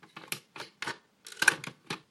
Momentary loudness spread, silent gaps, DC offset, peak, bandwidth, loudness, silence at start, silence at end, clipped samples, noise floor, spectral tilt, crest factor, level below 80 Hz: 19 LU; none; under 0.1%; -4 dBFS; 16 kHz; -32 LUFS; 0.15 s; 0.1 s; under 0.1%; -51 dBFS; -1 dB/octave; 32 dB; -80 dBFS